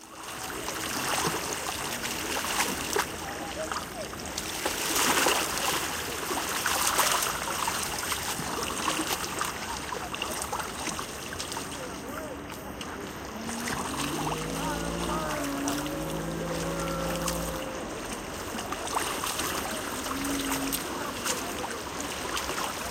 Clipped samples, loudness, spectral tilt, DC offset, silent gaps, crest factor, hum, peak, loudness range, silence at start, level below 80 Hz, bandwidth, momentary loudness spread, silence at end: under 0.1%; -30 LUFS; -2.5 dB/octave; under 0.1%; none; 22 dB; none; -8 dBFS; 7 LU; 0 s; -48 dBFS; 16.5 kHz; 10 LU; 0 s